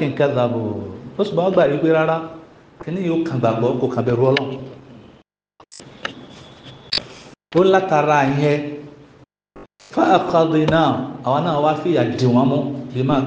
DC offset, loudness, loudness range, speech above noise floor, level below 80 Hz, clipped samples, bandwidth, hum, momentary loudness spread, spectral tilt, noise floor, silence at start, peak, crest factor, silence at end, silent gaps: under 0.1%; -18 LUFS; 6 LU; 36 dB; -56 dBFS; under 0.1%; 9 kHz; none; 16 LU; -7 dB/octave; -53 dBFS; 0 s; 0 dBFS; 18 dB; 0 s; none